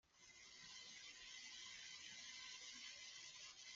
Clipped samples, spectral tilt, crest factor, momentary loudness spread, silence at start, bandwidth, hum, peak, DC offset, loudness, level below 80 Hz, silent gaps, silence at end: under 0.1%; 1.5 dB/octave; 16 dB; 5 LU; 0.05 s; 9 kHz; none; -42 dBFS; under 0.1%; -55 LUFS; -88 dBFS; none; 0 s